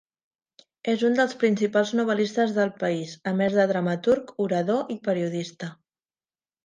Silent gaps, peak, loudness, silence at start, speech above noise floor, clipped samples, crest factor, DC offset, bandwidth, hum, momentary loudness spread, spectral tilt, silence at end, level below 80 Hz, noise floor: none; -8 dBFS; -24 LUFS; 0.85 s; over 66 dB; under 0.1%; 18 dB; under 0.1%; 9.6 kHz; none; 8 LU; -6 dB/octave; 0.9 s; -68 dBFS; under -90 dBFS